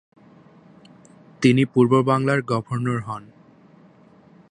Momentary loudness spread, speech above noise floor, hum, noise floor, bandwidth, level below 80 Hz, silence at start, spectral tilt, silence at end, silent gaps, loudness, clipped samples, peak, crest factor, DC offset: 11 LU; 32 dB; none; -51 dBFS; 10 kHz; -64 dBFS; 1.4 s; -7 dB/octave; 1.3 s; none; -20 LUFS; under 0.1%; -4 dBFS; 20 dB; under 0.1%